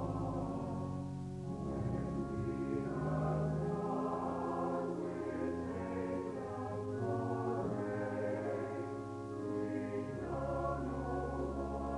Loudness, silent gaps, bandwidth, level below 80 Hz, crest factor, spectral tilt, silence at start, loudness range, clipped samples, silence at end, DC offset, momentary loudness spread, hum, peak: -39 LUFS; none; 11.5 kHz; -54 dBFS; 14 dB; -8.5 dB/octave; 0 s; 2 LU; under 0.1%; 0 s; under 0.1%; 5 LU; none; -24 dBFS